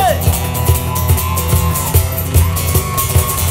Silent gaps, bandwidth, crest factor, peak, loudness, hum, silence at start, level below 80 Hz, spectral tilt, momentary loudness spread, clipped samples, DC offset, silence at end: none; 16.5 kHz; 14 dB; 0 dBFS; -14 LUFS; none; 0 s; -22 dBFS; -4.5 dB/octave; 2 LU; under 0.1%; under 0.1%; 0 s